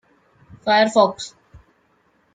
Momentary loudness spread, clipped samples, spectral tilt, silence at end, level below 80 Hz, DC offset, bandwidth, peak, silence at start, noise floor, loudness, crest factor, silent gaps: 19 LU; under 0.1%; -4 dB/octave; 1.05 s; -60 dBFS; under 0.1%; 9.4 kHz; -2 dBFS; 0.65 s; -62 dBFS; -18 LUFS; 20 dB; none